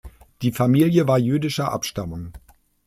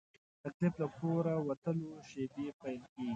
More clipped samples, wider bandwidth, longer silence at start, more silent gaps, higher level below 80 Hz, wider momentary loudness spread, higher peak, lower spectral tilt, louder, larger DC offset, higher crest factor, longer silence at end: neither; first, 15.5 kHz vs 7.8 kHz; second, 0.05 s vs 0.45 s; second, none vs 0.54-0.60 s, 1.57-1.62 s, 2.53-2.59 s, 2.89-2.96 s; first, -48 dBFS vs -74 dBFS; first, 15 LU vs 11 LU; first, -6 dBFS vs -20 dBFS; second, -6.5 dB/octave vs -8.5 dB/octave; first, -21 LUFS vs -38 LUFS; neither; about the same, 16 dB vs 18 dB; first, 0.5 s vs 0 s